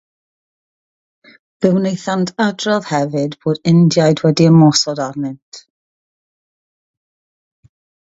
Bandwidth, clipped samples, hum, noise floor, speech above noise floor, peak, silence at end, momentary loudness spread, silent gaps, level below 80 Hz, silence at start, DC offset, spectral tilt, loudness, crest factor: 7.8 kHz; under 0.1%; none; under -90 dBFS; over 76 dB; 0 dBFS; 2.5 s; 12 LU; 5.42-5.52 s; -60 dBFS; 1.6 s; under 0.1%; -6 dB/octave; -14 LUFS; 16 dB